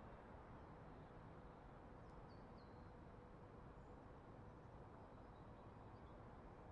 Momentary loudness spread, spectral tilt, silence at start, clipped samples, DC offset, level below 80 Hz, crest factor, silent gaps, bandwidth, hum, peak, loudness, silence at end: 1 LU; -7 dB/octave; 0 s; under 0.1%; under 0.1%; -68 dBFS; 12 dB; none; 6.6 kHz; none; -48 dBFS; -61 LUFS; 0 s